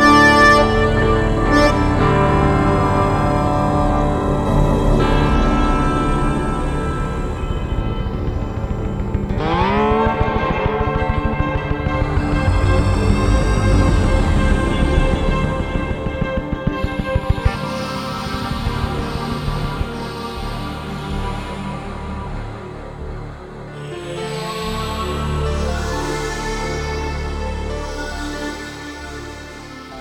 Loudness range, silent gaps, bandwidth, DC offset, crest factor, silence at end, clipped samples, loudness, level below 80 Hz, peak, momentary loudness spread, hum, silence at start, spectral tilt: 11 LU; none; 13.5 kHz; under 0.1%; 16 dB; 0 s; under 0.1%; -19 LUFS; -24 dBFS; 0 dBFS; 13 LU; none; 0 s; -6.5 dB/octave